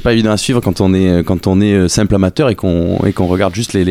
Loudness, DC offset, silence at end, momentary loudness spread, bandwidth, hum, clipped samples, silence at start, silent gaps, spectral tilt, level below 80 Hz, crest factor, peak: -13 LUFS; under 0.1%; 0 s; 3 LU; 15.5 kHz; none; under 0.1%; 0 s; none; -6 dB/octave; -32 dBFS; 10 dB; -2 dBFS